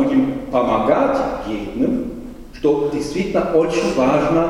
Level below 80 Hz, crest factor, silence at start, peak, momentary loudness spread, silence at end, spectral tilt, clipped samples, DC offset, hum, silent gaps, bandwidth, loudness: -40 dBFS; 16 dB; 0 s; -2 dBFS; 9 LU; 0 s; -6.5 dB/octave; under 0.1%; under 0.1%; none; none; 12 kHz; -18 LUFS